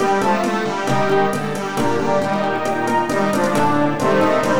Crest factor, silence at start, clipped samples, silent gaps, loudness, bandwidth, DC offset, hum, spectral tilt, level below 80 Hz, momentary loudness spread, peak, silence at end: 12 dB; 0 s; under 0.1%; none; -18 LUFS; over 20 kHz; 2%; none; -5.5 dB/octave; -50 dBFS; 4 LU; -4 dBFS; 0 s